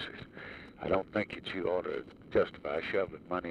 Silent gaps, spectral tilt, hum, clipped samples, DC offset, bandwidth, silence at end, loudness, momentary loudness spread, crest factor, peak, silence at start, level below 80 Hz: none; -7 dB/octave; none; under 0.1%; under 0.1%; 10 kHz; 0 s; -35 LUFS; 14 LU; 18 dB; -16 dBFS; 0 s; -60 dBFS